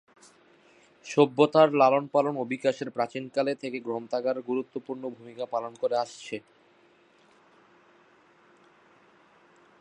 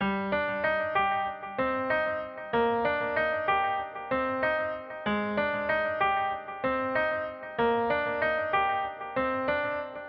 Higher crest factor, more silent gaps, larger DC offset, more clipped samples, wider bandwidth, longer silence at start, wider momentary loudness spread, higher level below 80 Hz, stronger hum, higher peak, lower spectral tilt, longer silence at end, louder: first, 22 dB vs 16 dB; neither; neither; neither; first, 10 kHz vs 5.6 kHz; first, 1.05 s vs 0 s; first, 17 LU vs 6 LU; second, -82 dBFS vs -58 dBFS; neither; first, -6 dBFS vs -14 dBFS; first, -6 dB/octave vs -2.5 dB/octave; first, 3.4 s vs 0 s; about the same, -27 LUFS vs -29 LUFS